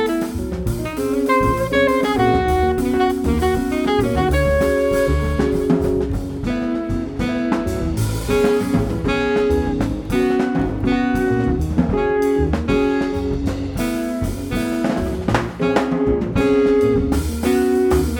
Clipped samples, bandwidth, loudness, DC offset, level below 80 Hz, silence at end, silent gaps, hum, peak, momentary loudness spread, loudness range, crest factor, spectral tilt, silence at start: under 0.1%; 19 kHz; -19 LUFS; under 0.1%; -28 dBFS; 0 s; none; none; -2 dBFS; 6 LU; 3 LU; 16 dB; -6.5 dB/octave; 0 s